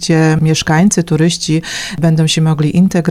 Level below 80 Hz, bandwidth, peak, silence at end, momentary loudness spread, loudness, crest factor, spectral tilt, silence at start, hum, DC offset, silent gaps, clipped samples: -40 dBFS; 13.5 kHz; 0 dBFS; 0 s; 5 LU; -12 LUFS; 12 dB; -5.5 dB/octave; 0 s; none; under 0.1%; none; under 0.1%